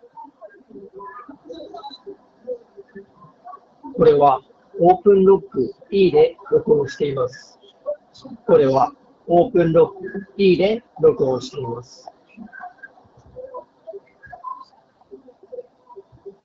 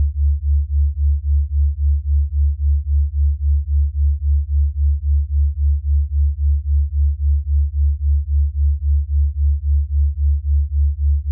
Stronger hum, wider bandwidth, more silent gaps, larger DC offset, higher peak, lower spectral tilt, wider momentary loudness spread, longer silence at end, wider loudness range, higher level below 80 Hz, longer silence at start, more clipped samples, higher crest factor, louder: neither; first, 7.4 kHz vs 0.1 kHz; neither; neither; first, -2 dBFS vs -10 dBFS; second, -6 dB/octave vs -28 dB/octave; first, 24 LU vs 2 LU; first, 0.15 s vs 0 s; first, 22 LU vs 0 LU; second, -54 dBFS vs -16 dBFS; first, 0.15 s vs 0 s; neither; first, 18 dB vs 6 dB; about the same, -17 LUFS vs -19 LUFS